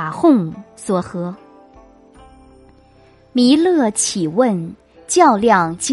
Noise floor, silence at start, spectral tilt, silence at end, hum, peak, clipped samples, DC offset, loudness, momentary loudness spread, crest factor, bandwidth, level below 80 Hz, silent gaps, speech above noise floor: -49 dBFS; 0 s; -4.5 dB/octave; 0 s; none; 0 dBFS; under 0.1%; under 0.1%; -15 LUFS; 15 LU; 18 dB; 11.5 kHz; -54 dBFS; none; 34 dB